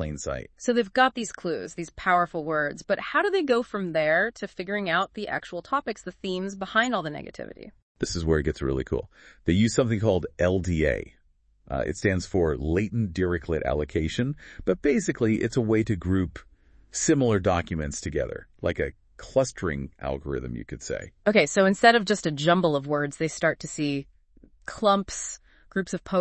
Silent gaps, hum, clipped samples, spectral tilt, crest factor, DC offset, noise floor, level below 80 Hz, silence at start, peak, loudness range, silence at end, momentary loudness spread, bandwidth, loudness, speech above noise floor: 7.82-7.95 s; none; under 0.1%; -5 dB/octave; 24 dB; under 0.1%; -63 dBFS; -46 dBFS; 0 s; -2 dBFS; 5 LU; 0 s; 12 LU; 8.8 kHz; -26 LUFS; 37 dB